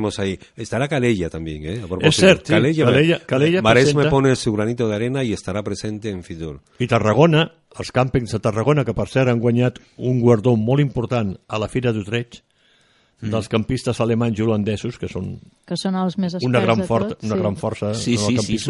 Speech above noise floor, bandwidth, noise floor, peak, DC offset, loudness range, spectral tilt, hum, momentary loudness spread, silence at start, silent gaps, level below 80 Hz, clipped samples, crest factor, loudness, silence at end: 39 dB; 11.5 kHz; -58 dBFS; 0 dBFS; under 0.1%; 7 LU; -6 dB/octave; none; 13 LU; 0 s; none; -44 dBFS; under 0.1%; 18 dB; -19 LUFS; 0 s